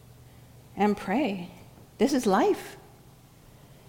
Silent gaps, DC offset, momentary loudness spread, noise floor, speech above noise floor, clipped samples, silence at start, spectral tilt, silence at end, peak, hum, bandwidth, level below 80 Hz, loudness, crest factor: none; under 0.1%; 21 LU; -53 dBFS; 28 dB; under 0.1%; 0.75 s; -5.5 dB/octave; 1.1 s; -10 dBFS; none; 18.5 kHz; -60 dBFS; -27 LUFS; 18 dB